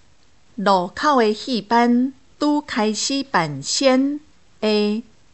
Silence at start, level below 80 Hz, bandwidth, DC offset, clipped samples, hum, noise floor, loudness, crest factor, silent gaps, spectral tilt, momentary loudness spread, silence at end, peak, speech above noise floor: 0.6 s; -60 dBFS; 8.4 kHz; 0.3%; under 0.1%; none; -58 dBFS; -20 LUFS; 18 dB; none; -4 dB/octave; 8 LU; 0.35 s; -2 dBFS; 39 dB